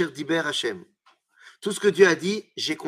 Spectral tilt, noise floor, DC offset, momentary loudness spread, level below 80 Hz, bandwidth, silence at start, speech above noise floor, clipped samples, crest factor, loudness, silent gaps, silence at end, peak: -4 dB/octave; -60 dBFS; under 0.1%; 13 LU; -76 dBFS; 15 kHz; 0 s; 37 dB; under 0.1%; 22 dB; -23 LUFS; none; 0 s; -4 dBFS